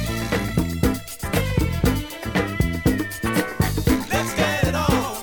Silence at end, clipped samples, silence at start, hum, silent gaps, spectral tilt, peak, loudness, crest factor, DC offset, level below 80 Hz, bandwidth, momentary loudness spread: 0 s; under 0.1%; 0 s; none; none; -5.5 dB/octave; -6 dBFS; -22 LUFS; 16 dB; under 0.1%; -30 dBFS; over 20 kHz; 4 LU